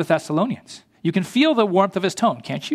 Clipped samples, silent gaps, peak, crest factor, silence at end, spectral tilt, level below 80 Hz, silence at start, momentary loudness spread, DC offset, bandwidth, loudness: under 0.1%; none; -2 dBFS; 18 dB; 0 s; -5.5 dB/octave; -68 dBFS; 0 s; 10 LU; under 0.1%; 14.5 kHz; -20 LUFS